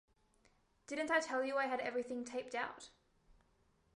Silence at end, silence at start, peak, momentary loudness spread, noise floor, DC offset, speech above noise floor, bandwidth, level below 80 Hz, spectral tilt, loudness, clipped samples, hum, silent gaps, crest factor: 1.1 s; 0.9 s; -20 dBFS; 11 LU; -75 dBFS; under 0.1%; 36 dB; 11.5 kHz; -76 dBFS; -2.5 dB/octave; -39 LUFS; under 0.1%; none; none; 22 dB